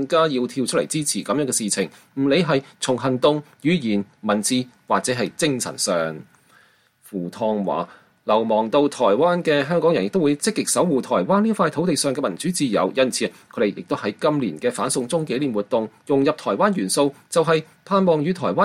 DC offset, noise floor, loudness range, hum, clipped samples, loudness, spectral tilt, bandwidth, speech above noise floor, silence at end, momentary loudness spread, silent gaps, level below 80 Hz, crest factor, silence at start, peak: under 0.1%; -57 dBFS; 4 LU; none; under 0.1%; -21 LUFS; -4.5 dB/octave; 16 kHz; 36 dB; 0 s; 6 LU; none; -64 dBFS; 16 dB; 0 s; -6 dBFS